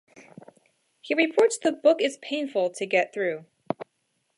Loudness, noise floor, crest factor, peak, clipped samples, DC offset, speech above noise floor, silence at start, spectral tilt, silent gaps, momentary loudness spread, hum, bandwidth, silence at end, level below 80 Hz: -25 LUFS; -74 dBFS; 20 dB; -6 dBFS; under 0.1%; under 0.1%; 50 dB; 1.05 s; -3.5 dB/octave; none; 13 LU; none; 11.5 kHz; 0.55 s; -82 dBFS